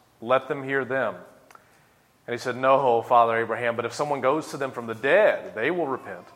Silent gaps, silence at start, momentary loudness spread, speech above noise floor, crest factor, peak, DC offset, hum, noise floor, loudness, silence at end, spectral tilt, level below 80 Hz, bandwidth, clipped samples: none; 0.2 s; 12 LU; 36 dB; 20 dB; -6 dBFS; under 0.1%; none; -60 dBFS; -24 LUFS; 0.15 s; -5 dB/octave; -74 dBFS; 15.5 kHz; under 0.1%